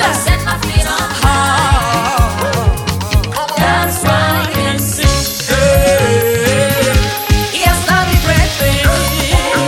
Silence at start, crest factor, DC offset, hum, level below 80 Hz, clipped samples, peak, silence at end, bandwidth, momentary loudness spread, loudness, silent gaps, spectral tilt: 0 s; 12 dB; under 0.1%; none; -20 dBFS; under 0.1%; 0 dBFS; 0 s; 18 kHz; 4 LU; -12 LUFS; none; -4 dB/octave